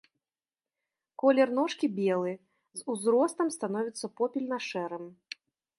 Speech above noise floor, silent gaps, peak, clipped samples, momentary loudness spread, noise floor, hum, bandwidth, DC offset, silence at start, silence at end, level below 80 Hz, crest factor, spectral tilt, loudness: over 61 dB; none; -12 dBFS; under 0.1%; 18 LU; under -90 dBFS; none; 11.5 kHz; under 0.1%; 1.25 s; 0.65 s; -84 dBFS; 20 dB; -5 dB/octave; -29 LUFS